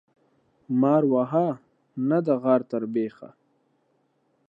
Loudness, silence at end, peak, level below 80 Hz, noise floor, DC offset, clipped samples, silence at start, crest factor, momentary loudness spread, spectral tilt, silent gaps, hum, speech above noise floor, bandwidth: -24 LUFS; 1.2 s; -8 dBFS; -78 dBFS; -69 dBFS; under 0.1%; under 0.1%; 0.7 s; 18 dB; 11 LU; -10.5 dB/octave; none; none; 46 dB; 4.9 kHz